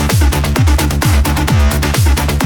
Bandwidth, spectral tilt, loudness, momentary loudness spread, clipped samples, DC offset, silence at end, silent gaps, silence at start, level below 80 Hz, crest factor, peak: 19.5 kHz; -5 dB/octave; -13 LUFS; 1 LU; under 0.1%; under 0.1%; 0 s; none; 0 s; -14 dBFS; 8 dB; -4 dBFS